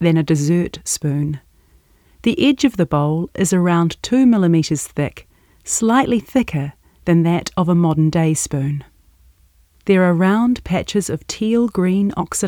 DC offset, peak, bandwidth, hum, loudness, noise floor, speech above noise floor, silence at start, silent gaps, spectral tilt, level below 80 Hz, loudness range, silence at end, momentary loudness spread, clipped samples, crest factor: under 0.1%; -2 dBFS; 17.5 kHz; none; -17 LUFS; -54 dBFS; 37 dB; 0 s; none; -5.5 dB/octave; -46 dBFS; 2 LU; 0 s; 9 LU; under 0.1%; 16 dB